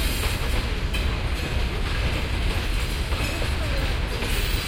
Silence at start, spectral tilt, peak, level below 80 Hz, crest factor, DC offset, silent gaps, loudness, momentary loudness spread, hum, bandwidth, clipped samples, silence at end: 0 s; -4.5 dB/octave; -10 dBFS; -26 dBFS; 14 dB; under 0.1%; none; -26 LUFS; 2 LU; none; 16.5 kHz; under 0.1%; 0 s